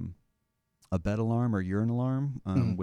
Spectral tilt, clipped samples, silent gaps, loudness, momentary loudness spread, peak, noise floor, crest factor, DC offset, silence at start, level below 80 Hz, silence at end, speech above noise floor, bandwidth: -9.5 dB/octave; under 0.1%; none; -30 LUFS; 5 LU; -14 dBFS; -79 dBFS; 16 dB; under 0.1%; 0 s; -52 dBFS; 0 s; 50 dB; 7.8 kHz